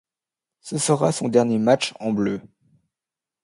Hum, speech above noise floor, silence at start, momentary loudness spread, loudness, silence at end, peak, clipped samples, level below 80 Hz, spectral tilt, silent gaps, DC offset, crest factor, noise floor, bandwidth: none; 68 dB; 0.65 s; 8 LU; -21 LUFS; 0.95 s; -4 dBFS; under 0.1%; -64 dBFS; -5 dB/octave; none; under 0.1%; 20 dB; -89 dBFS; 11.5 kHz